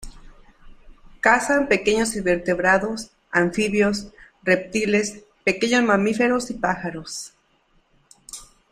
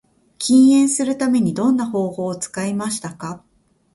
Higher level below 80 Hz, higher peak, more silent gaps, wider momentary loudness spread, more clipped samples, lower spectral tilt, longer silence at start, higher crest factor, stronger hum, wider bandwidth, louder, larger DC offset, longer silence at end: first, -48 dBFS vs -60 dBFS; about the same, -2 dBFS vs -4 dBFS; neither; about the same, 15 LU vs 17 LU; neither; about the same, -4 dB/octave vs -5 dB/octave; second, 0 s vs 0.4 s; first, 22 dB vs 16 dB; neither; first, 14.5 kHz vs 11.5 kHz; second, -21 LUFS vs -18 LUFS; neither; second, 0.3 s vs 0.55 s